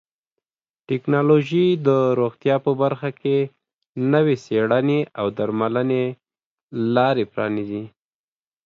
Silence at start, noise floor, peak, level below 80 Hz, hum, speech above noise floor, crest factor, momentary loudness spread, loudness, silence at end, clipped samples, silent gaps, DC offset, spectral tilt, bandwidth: 0.9 s; under -90 dBFS; -4 dBFS; -64 dBFS; none; over 70 dB; 18 dB; 10 LU; -21 LUFS; 0.75 s; under 0.1%; 3.74-3.79 s, 3.89-3.93 s, 6.45-6.67 s; under 0.1%; -8.5 dB/octave; 7.2 kHz